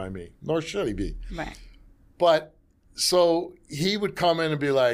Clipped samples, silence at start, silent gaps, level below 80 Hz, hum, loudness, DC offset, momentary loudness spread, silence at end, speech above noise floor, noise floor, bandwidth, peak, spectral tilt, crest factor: under 0.1%; 0 s; none; -44 dBFS; none; -25 LUFS; under 0.1%; 15 LU; 0 s; 28 dB; -53 dBFS; 15.5 kHz; -8 dBFS; -4 dB/octave; 18 dB